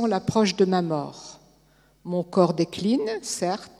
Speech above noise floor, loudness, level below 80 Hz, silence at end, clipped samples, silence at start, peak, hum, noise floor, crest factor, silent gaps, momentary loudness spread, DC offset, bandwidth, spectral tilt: 36 dB; -24 LUFS; -60 dBFS; 0.1 s; under 0.1%; 0 s; -4 dBFS; none; -60 dBFS; 20 dB; none; 16 LU; under 0.1%; 13.5 kHz; -5.5 dB/octave